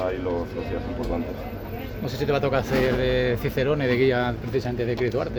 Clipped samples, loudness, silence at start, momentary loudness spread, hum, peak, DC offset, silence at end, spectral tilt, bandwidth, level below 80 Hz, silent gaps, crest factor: under 0.1%; -25 LUFS; 0 s; 10 LU; none; -8 dBFS; under 0.1%; 0 s; -7 dB/octave; over 20 kHz; -38 dBFS; none; 16 dB